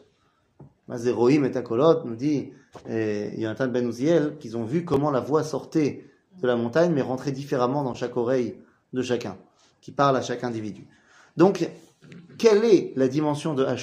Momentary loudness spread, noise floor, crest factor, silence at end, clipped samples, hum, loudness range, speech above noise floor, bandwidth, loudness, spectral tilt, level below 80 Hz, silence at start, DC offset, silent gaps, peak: 12 LU; -66 dBFS; 20 dB; 0 s; under 0.1%; none; 3 LU; 43 dB; 11.5 kHz; -24 LUFS; -6.5 dB/octave; -64 dBFS; 0.6 s; under 0.1%; none; -4 dBFS